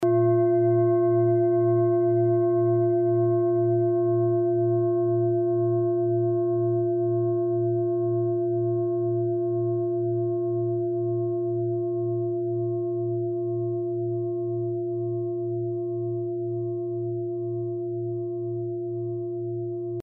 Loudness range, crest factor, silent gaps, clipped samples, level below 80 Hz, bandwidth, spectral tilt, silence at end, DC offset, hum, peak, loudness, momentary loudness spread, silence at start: 7 LU; 12 dB; none; under 0.1%; -72 dBFS; 2.2 kHz; -9.5 dB/octave; 0 s; under 0.1%; none; -12 dBFS; -25 LUFS; 9 LU; 0 s